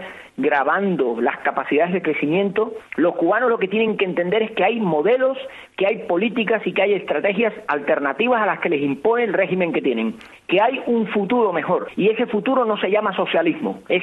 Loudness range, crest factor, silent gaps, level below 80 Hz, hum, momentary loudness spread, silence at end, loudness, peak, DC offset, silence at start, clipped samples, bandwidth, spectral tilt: 1 LU; 14 dB; none; -64 dBFS; none; 4 LU; 0 s; -20 LUFS; -6 dBFS; under 0.1%; 0 s; under 0.1%; 4.4 kHz; -8 dB/octave